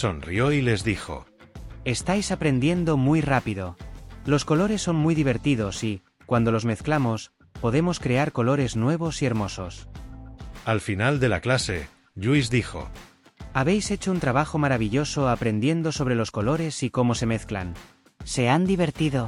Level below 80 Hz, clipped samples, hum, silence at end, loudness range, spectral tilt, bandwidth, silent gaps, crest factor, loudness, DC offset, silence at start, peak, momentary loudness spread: -44 dBFS; under 0.1%; none; 0 s; 2 LU; -6 dB/octave; 12 kHz; none; 16 dB; -24 LUFS; under 0.1%; 0 s; -8 dBFS; 15 LU